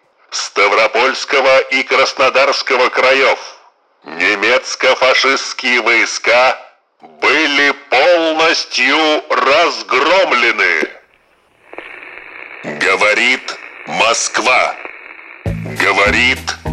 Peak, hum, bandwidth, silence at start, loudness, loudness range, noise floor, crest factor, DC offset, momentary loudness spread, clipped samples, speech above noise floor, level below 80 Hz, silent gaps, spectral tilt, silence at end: -2 dBFS; none; 13.5 kHz; 0.3 s; -12 LUFS; 4 LU; -53 dBFS; 12 dB; under 0.1%; 16 LU; under 0.1%; 40 dB; -42 dBFS; none; -2 dB/octave; 0 s